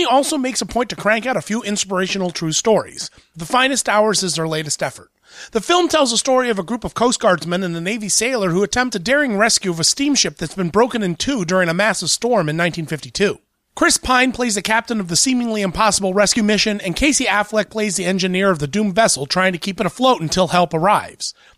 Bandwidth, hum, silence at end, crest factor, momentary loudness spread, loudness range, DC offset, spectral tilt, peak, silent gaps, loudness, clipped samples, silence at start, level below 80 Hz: 15.5 kHz; none; 0.25 s; 16 dB; 7 LU; 2 LU; under 0.1%; -3 dB/octave; -2 dBFS; none; -17 LUFS; under 0.1%; 0 s; -44 dBFS